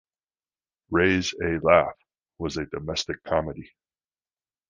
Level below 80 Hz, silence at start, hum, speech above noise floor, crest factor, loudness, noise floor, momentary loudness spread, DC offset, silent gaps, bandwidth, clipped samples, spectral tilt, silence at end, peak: -48 dBFS; 0.9 s; none; over 66 dB; 26 dB; -25 LUFS; under -90 dBFS; 13 LU; under 0.1%; none; 9.8 kHz; under 0.1%; -5 dB/octave; 1.05 s; -2 dBFS